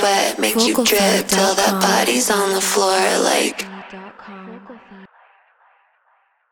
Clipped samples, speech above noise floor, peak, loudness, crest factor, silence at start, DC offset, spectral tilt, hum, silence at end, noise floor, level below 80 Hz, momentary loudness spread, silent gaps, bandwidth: under 0.1%; 45 dB; 0 dBFS; -16 LUFS; 18 dB; 0 s; under 0.1%; -2.5 dB/octave; none; 1.45 s; -61 dBFS; -58 dBFS; 22 LU; none; over 20 kHz